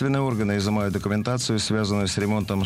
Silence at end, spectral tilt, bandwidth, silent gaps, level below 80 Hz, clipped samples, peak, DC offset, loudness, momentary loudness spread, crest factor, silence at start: 0 s; -5.5 dB/octave; 15.5 kHz; none; -48 dBFS; under 0.1%; -12 dBFS; under 0.1%; -24 LUFS; 2 LU; 12 dB; 0 s